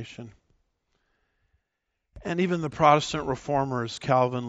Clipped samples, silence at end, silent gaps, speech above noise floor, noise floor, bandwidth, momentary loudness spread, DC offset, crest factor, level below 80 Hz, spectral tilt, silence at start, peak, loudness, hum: under 0.1%; 0 s; none; 56 dB; -81 dBFS; 8 kHz; 17 LU; under 0.1%; 22 dB; -56 dBFS; -5 dB/octave; 0 s; -6 dBFS; -25 LUFS; none